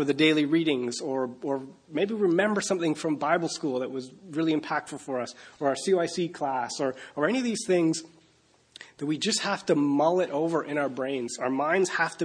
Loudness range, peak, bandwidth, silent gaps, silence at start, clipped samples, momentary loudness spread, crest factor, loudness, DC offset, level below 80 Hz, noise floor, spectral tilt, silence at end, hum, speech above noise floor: 3 LU; -10 dBFS; 10.5 kHz; none; 0 s; under 0.1%; 9 LU; 18 dB; -27 LUFS; under 0.1%; -74 dBFS; -63 dBFS; -4.5 dB/octave; 0 s; none; 36 dB